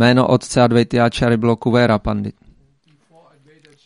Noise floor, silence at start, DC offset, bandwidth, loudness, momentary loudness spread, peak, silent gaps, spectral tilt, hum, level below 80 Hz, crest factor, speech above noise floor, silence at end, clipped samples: -57 dBFS; 0 s; under 0.1%; 11.5 kHz; -16 LUFS; 8 LU; 0 dBFS; none; -6.5 dB/octave; none; -40 dBFS; 16 dB; 42 dB; 1.55 s; under 0.1%